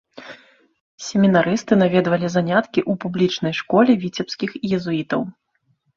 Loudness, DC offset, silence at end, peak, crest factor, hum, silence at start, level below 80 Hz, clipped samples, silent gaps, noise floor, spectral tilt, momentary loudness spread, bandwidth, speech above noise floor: -19 LUFS; under 0.1%; 0.65 s; -2 dBFS; 18 dB; none; 0.15 s; -60 dBFS; under 0.1%; 0.80-0.98 s; -66 dBFS; -6 dB/octave; 12 LU; 7.6 kHz; 47 dB